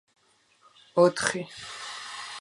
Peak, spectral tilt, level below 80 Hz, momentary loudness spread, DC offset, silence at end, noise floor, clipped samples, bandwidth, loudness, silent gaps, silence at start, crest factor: -8 dBFS; -4 dB/octave; -68 dBFS; 15 LU; under 0.1%; 0 s; -64 dBFS; under 0.1%; 11.5 kHz; -28 LUFS; none; 0.95 s; 22 dB